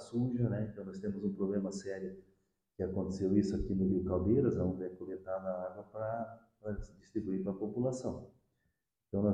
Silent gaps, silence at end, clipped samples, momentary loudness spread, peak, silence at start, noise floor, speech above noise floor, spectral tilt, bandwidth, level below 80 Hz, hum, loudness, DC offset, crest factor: none; 0 s; under 0.1%; 12 LU; -16 dBFS; 0 s; -83 dBFS; 47 dB; -8.5 dB/octave; 9.6 kHz; -54 dBFS; none; -36 LUFS; under 0.1%; 20 dB